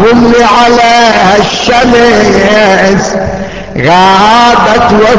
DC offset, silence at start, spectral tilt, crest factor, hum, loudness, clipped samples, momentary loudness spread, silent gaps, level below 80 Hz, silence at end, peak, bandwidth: under 0.1%; 0 s; -4.5 dB/octave; 4 dB; none; -5 LUFS; 5%; 8 LU; none; -28 dBFS; 0 s; 0 dBFS; 8 kHz